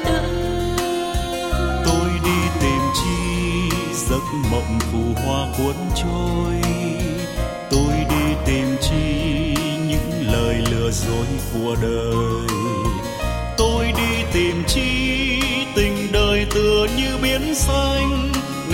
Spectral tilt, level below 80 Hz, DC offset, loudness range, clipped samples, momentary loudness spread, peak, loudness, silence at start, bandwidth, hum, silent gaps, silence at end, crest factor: -5 dB/octave; -26 dBFS; under 0.1%; 3 LU; under 0.1%; 5 LU; -4 dBFS; -20 LUFS; 0 s; 16.5 kHz; none; none; 0 s; 14 dB